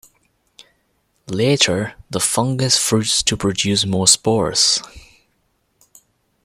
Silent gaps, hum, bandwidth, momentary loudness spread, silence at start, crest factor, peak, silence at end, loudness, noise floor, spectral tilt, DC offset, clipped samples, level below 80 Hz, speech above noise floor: none; none; 16.5 kHz; 8 LU; 1.3 s; 20 dB; 0 dBFS; 1.45 s; -16 LUFS; -66 dBFS; -3 dB/octave; under 0.1%; under 0.1%; -50 dBFS; 48 dB